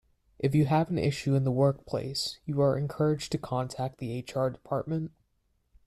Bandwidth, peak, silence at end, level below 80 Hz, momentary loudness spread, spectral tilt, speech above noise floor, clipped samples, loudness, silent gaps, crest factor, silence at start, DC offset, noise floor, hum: 13 kHz; -12 dBFS; 0.8 s; -58 dBFS; 9 LU; -7 dB/octave; 45 dB; under 0.1%; -29 LUFS; none; 16 dB; 0.4 s; under 0.1%; -73 dBFS; none